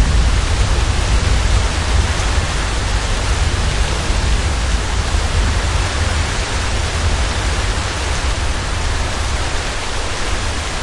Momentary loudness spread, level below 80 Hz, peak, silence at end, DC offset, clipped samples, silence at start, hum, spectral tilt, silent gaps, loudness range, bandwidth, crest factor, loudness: 4 LU; -18 dBFS; -2 dBFS; 0 s; under 0.1%; under 0.1%; 0 s; none; -4 dB/octave; none; 2 LU; 11.5 kHz; 14 dB; -18 LUFS